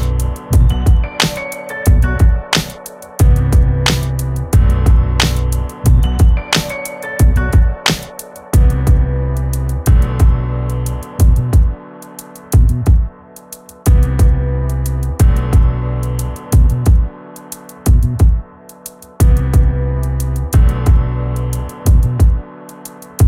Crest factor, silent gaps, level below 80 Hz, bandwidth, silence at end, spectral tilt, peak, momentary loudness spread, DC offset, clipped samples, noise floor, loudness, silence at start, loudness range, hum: 12 dB; none; -14 dBFS; 16 kHz; 0 s; -5.5 dB/octave; 0 dBFS; 17 LU; under 0.1%; under 0.1%; -36 dBFS; -14 LUFS; 0 s; 2 LU; none